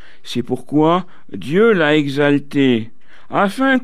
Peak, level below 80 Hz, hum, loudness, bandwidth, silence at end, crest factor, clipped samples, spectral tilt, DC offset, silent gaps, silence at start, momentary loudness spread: -4 dBFS; -58 dBFS; none; -16 LUFS; 14 kHz; 0.05 s; 14 dB; under 0.1%; -6.5 dB/octave; 3%; none; 0.25 s; 12 LU